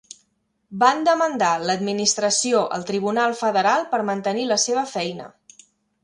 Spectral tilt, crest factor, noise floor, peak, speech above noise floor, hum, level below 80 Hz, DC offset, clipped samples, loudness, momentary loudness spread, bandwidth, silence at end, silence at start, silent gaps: -2.5 dB/octave; 20 dB; -69 dBFS; -2 dBFS; 48 dB; none; -68 dBFS; under 0.1%; under 0.1%; -21 LUFS; 7 LU; 11.5 kHz; 0.75 s; 0.7 s; none